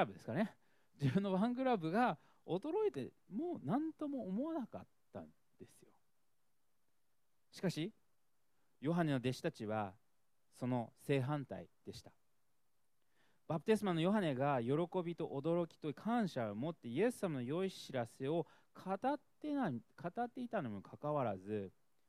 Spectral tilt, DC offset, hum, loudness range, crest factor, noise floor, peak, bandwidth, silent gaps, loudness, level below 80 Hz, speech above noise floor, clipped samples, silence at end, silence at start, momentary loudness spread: -7 dB/octave; under 0.1%; none; 10 LU; 20 dB; -87 dBFS; -20 dBFS; 14.5 kHz; none; -40 LUFS; -78 dBFS; 48 dB; under 0.1%; 0.4 s; 0 s; 13 LU